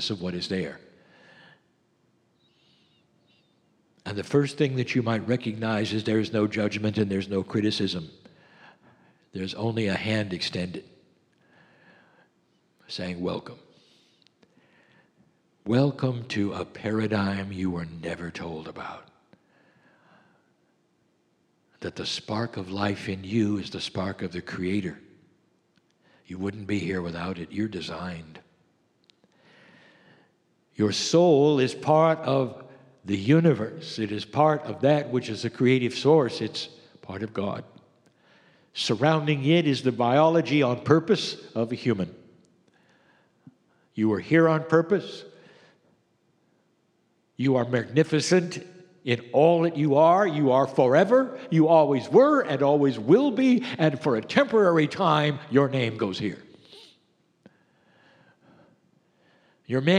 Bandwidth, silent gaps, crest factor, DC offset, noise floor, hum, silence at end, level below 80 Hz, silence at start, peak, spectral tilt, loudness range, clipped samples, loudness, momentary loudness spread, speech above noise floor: 11 kHz; none; 24 dB; under 0.1%; -69 dBFS; none; 0 s; -66 dBFS; 0 s; -2 dBFS; -6 dB/octave; 16 LU; under 0.1%; -24 LUFS; 15 LU; 45 dB